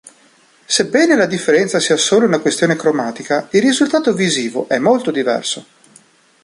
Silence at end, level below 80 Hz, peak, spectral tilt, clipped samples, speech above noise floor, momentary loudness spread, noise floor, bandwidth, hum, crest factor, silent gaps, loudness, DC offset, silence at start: 0.8 s; -60 dBFS; 0 dBFS; -3.5 dB/octave; under 0.1%; 36 dB; 6 LU; -51 dBFS; 11.5 kHz; none; 14 dB; none; -15 LUFS; under 0.1%; 0.7 s